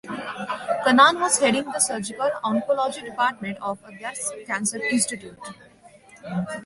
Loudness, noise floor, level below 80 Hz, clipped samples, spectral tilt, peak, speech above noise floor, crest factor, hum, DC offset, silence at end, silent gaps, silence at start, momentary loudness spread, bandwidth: -23 LUFS; -50 dBFS; -64 dBFS; under 0.1%; -2.5 dB/octave; -2 dBFS; 27 dB; 22 dB; none; under 0.1%; 0 s; none; 0.05 s; 17 LU; 12 kHz